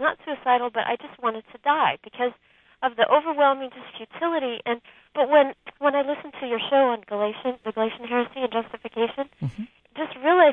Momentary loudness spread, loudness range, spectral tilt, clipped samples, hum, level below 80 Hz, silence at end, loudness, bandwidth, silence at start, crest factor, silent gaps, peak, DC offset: 13 LU; 3 LU; -7.5 dB/octave; under 0.1%; none; -68 dBFS; 0 s; -24 LUFS; 4 kHz; 0 s; 20 dB; none; -4 dBFS; under 0.1%